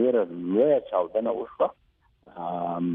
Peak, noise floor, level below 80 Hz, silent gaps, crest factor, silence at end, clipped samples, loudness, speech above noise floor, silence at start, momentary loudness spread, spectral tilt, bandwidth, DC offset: -10 dBFS; -58 dBFS; -66 dBFS; none; 16 dB; 0 s; under 0.1%; -26 LUFS; 32 dB; 0 s; 9 LU; -11 dB/octave; 3.8 kHz; under 0.1%